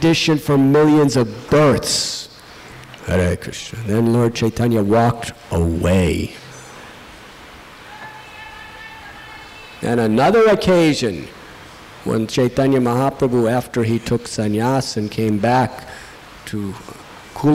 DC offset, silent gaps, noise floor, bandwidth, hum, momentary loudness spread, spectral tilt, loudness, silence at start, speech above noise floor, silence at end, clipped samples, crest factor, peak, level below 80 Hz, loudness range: under 0.1%; none; -39 dBFS; 16 kHz; none; 23 LU; -5.5 dB/octave; -17 LUFS; 0 s; 23 dB; 0 s; under 0.1%; 8 dB; -10 dBFS; -40 dBFS; 8 LU